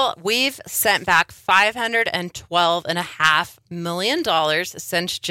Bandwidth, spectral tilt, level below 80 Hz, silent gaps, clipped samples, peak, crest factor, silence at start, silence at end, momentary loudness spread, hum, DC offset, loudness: 17 kHz; -2 dB/octave; -58 dBFS; none; under 0.1%; -4 dBFS; 18 dB; 0 s; 0 s; 8 LU; none; under 0.1%; -19 LUFS